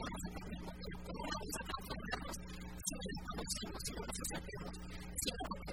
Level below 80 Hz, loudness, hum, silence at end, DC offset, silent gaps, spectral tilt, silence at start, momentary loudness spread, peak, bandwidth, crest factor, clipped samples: -52 dBFS; -44 LUFS; none; 0 s; 0.2%; none; -3 dB/octave; 0 s; 7 LU; -22 dBFS; 16 kHz; 22 dB; under 0.1%